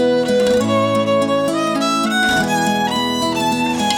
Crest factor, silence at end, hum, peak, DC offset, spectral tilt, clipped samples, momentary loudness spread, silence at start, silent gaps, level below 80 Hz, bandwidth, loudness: 14 dB; 0 s; none; -2 dBFS; under 0.1%; -4 dB/octave; under 0.1%; 3 LU; 0 s; none; -48 dBFS; 18 kHz; -16 LUFS